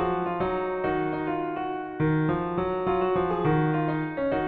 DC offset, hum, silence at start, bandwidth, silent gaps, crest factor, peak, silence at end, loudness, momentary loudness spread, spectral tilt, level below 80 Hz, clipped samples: under 0.1%; none; 0 s; 4.4 kHz; none; 14 dB; -12 dBFS; 0 s; -27 LUFS; 5 LU; -10.5 dB/octave; -50 dBFS; under 0.1%